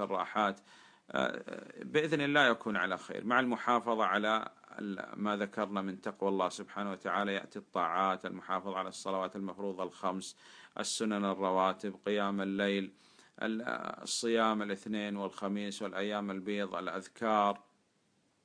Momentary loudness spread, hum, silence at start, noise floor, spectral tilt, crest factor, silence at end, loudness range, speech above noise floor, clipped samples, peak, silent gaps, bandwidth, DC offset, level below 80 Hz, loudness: 10 LU; none; 0 s; -74 dBFS; -4 dB/octave; 22 dB; 0.85 s; 5 LU; 40 dB; under 0.1%; -12 dBFS; none; 10.5 kHz; under 0.1%; -82 dBFS; -34 LUFS